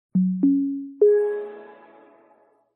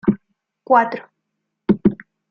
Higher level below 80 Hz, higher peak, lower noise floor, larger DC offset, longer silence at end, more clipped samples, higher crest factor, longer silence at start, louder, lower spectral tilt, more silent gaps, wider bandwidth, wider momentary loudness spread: second, -74 dBFS vs -50 dBFS; second, -8 dBFS vs 0 dBFS; second, -59 dBFS vs -77 dBFS; neither; first, 1.05 s vs 0.35 s; neither; about the same, 16 dB vs 20 dB; about the same, 0.15 s vs 0.05 s; second, -22 LUFS vs -19 LUFS; first, -12 dB/octave vs -10 dB/octave; neither; second, 2.8 kHz vs 5.8 kHz; about the same, 16 LU vs 15 LU